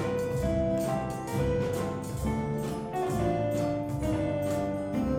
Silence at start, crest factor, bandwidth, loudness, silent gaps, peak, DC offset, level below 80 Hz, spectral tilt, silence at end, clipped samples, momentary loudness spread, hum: 0 s; 12 dB; 17 kHz; -30 LUFS; none; -16 dBFS; under 0.1%; -44 dBFS; -7 dB/octave; 0 s; under 0.1%; 4 LU; none